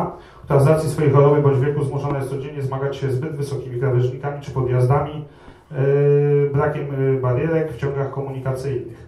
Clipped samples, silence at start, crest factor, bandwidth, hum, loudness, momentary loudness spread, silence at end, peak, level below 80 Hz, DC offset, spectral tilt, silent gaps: under 0.1%; 0 s; 18 dB; 12.5 kHz; none; -20 LUFS; 11 LU; 0 s; -2 dBFS; -48 dBFS; under 0.1%; -8.5 dB/octave; none